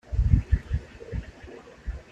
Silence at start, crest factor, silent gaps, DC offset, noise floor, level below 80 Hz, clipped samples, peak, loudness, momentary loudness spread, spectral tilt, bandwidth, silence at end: 0.1 s; 22 dB; none; under 0.1%; -46 dBFS; -30 dBFS; under 0.1%; -6 dBFS; -28 LUFS; 20 LU; -8.5 dB/octave; 7.4 kHz; 0.1 s